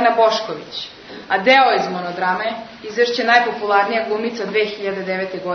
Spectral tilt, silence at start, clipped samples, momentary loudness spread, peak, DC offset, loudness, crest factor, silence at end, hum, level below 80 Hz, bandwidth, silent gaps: -4 dB/octave; 0 s; under 0.1%; 14 LU; 0 dBFS; under 0.1%; -18 LUFS; 18 dB; 0 s; none; -62 dBFS; 6.6 kHz; none